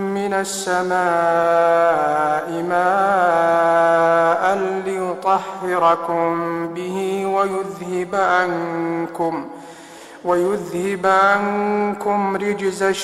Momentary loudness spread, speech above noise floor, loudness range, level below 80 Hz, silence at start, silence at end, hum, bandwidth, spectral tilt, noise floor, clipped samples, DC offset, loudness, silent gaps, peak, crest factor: 9 LU; 21 dB; 5 LU; -60 dBFS; 0 s; 0 s; none; 14.5 kHz; -5 dB/octave; -39 dBFS; under 0.1%; under 0.1%; -18 LUFS; none; -4 dBFS; 14 dB